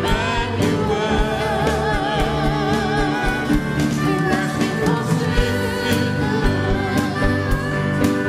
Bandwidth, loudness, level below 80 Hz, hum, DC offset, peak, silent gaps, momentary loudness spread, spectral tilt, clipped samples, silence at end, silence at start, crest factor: 16 kHz; -20 LUFS; -28 dBFS; none; under 0.1%; -4 dBFS; none; 2 LU; -6 dB/octave; under 0.1%; 0 s; 0 s; 16 dB